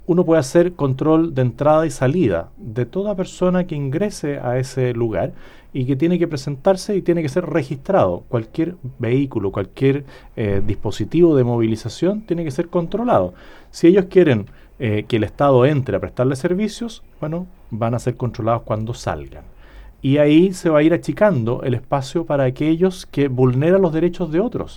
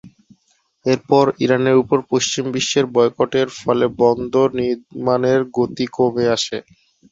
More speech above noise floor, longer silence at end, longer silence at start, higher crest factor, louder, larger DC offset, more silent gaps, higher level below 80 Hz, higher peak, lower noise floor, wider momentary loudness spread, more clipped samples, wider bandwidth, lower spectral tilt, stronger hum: second, 23 dB vs 46 dB; second, 0 s vs 0.5 s; about the same, 0.1 s vs 0.05 s; about the same, 18 dB vs 16 dB; about the same, -19 LUFS vs -18 LUFS; neither; neither; first, -40 dBFS vs -56 dBFS; about the same, -2 dBFS vs -2 dBFS; second, -41 dBFS vs -63 dBFS; first, 11 LU vs 6 LU; neither; first, 19 kHz vs 8 kHz; first, -7.5 dB/octave vs -4.5 dB/octave; neither